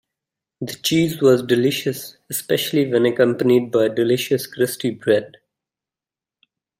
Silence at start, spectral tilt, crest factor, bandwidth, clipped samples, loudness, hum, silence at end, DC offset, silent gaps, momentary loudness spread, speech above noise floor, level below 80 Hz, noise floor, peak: 0.6 s; -5 dB/octave; 18 dB; 16 kHz; under 0.1%; -19 LUFS; none; 1.5 s; under 0.1%; none; 10 LU; 71 dB; -62 dBFS; -90 dBFS; -2 dBFS